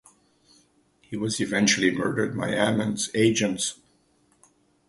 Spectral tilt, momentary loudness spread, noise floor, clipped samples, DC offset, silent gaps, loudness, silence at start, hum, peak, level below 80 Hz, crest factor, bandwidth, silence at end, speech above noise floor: -3.5 dB/octave; 8 LU; -64 dBFS; under 0.1%; under 0.1%; none; -24 LUFS; 1.1 s; none; -6 dBFS; -60 dBFS; 20 dB; 11.5 kHz; 1.15 s; 40 dB